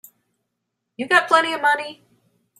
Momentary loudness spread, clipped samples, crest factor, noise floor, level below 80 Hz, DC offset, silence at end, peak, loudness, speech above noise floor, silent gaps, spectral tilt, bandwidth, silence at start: 17 LU; under 0.1%; 22 dB; -78 dBFS; -72 dBFS; under 0.1%; 0.65 s; -2 dBFS; -18 LUFS; 60 dB; none; -2 dB/octave; 15.5 kHz; 1 s